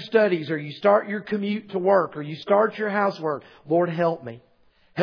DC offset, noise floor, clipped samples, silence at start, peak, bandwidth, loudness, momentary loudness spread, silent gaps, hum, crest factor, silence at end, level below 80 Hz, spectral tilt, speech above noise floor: under 0.1%; -59 dBFS; under 0.1%; 0 s; -6 dBFS; 5.4 kHz; -23 LUFS; 12 LU; none; none; 18 dB; 0 s; -72 dBFS; -8 dB/octave; 37 dB